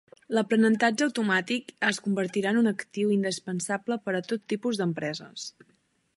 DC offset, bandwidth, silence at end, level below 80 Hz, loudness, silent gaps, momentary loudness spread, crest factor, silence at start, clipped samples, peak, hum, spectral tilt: under 0.1%; 11.5 kHz; 0.7 s; -76 dBFS; -27 LUFS; none; 10 LU; 18 dB; 0.3 s; under 0.1%; -10 dBFS; none; -4.5 dB/octave